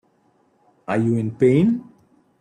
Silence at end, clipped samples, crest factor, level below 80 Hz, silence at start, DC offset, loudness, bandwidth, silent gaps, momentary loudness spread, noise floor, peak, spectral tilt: 0.6 s; under 0.1%; 16 dB; -60 dBFS; 0.9 s; under 0.1%; -20 LUFS; 9.6 kHz; none; 11 LU; -62 dBFS; -6 dBFS; -9 dB/octave